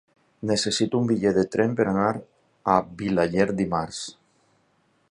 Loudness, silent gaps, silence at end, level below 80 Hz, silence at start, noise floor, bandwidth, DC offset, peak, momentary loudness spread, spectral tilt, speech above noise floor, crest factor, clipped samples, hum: -24 LUFS; none; 1 s; -54 dBFS; 0.4 s; -66 dBFS; 11 kHz; under 0.1%; -4 dBFS; 11 LU; -5 dB/octave; 43 dB; 20 dB; under 0.1%; none